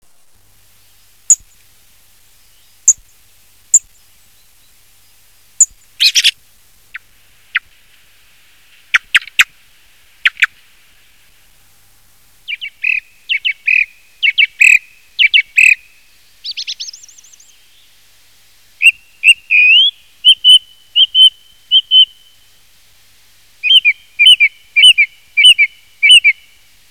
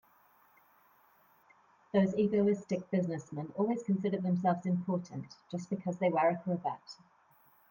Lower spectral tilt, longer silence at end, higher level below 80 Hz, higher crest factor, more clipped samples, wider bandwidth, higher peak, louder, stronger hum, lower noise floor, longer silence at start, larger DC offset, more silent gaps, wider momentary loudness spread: second, 6.5 dB/octave vs -8 dB/octave; second, 0.6 s vs 0.75 s; first, -60 dBFS vs -78 dBFS; about the same, 14 dB vs 18 dB; first, 0.2% vs under 0.1%; about the same, 16 kHz vs 16.5 kHz; first, 0 dBFS vs -16 dBFS; first, -9 LUFS vs -33 LUFS; neither; second, -51 dBFS vs -66 dBFS; second, 1.3 s vs 1.95 s; first, 0.4% vs under 0.1%; neither; about the same, 16 LU vs 14 LU